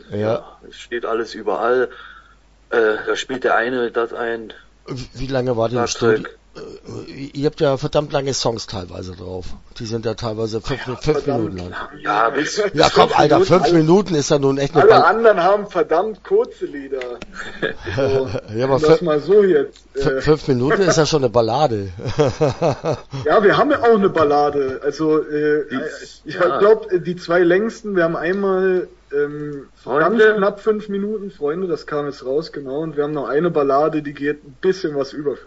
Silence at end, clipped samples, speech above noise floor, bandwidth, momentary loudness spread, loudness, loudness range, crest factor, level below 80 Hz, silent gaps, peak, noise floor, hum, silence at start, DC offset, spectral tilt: 0.05 s; under 0.1%; 33 dB; 8 kHz; 16 LU; -18 LUFS; 8 LU; 18 dB; -44 dBFS; none; 0 dBFS; -50 dBFS; none; 0.1 s; under 0.1%; -5.5 dB/octave